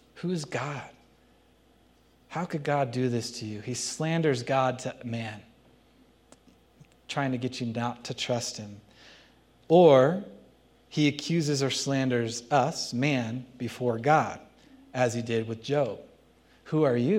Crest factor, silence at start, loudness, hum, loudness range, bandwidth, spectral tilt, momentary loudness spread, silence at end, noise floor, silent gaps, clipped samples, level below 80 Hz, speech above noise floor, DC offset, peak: 22 dB; 0.15 s; -28 LUFS; none; 9 LU; 15.5 kHz; -5.5 dB/octave; 13 LU; 0 s; -62 dBFS; none; under 0.1%; -68 dBFS; 35 dB; under 0.1%; -6 dBFS